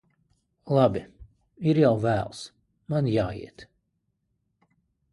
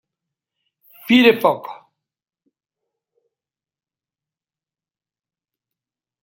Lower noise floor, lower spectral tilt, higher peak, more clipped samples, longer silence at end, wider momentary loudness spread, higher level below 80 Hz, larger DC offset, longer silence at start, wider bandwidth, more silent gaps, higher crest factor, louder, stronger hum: second, -76 dBFS vs under -90 dBFS; first, -8 dB/octave vs -5 dB/octave; second, -8 dBFS vs -2 dBFS; neither; second, 1.5 s vs 4.5 s; second, 19 LU vs 24 LU; first, -54 dBFS vs -68 dBFS; neither; second, 0.65 s vs 1.1 s; second, 11.5 kHz vs 16.5 kHz; neither; about the same, 20 dB vs 22 dB; second, -25 LUFS vs -15 LUFS; neither